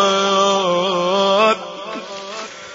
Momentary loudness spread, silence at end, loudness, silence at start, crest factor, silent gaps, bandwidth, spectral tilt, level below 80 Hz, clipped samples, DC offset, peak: 15 LU; 0 s; -16 LUFS; 0 s; 16 dB; none; 7.8 kHz; -3 dB/octave; -60 dBFS; under 0.1%; under 0.1%; -2 dBFS